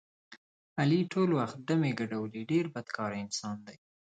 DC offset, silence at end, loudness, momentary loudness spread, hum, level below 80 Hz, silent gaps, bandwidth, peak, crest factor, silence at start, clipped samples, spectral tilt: under 0.1%; 0.4 s; -32 LUFS; 9 LU; none; -74 dBFS; 0.37-0.76 s; 9.2 kHz; -16 dBFS; 16 dB; 0.3 s; under 0.1%; -6 dB/octave